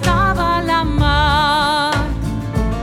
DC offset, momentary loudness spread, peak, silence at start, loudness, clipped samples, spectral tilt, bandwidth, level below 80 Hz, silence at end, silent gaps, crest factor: under 0.1%; 7 LU; -2 dBFS; 0 s; -16 LUFS; under 0.1%; -5 dB/octave; 15.5 kHz; -24 dBFS; 0 s; none; 14 dB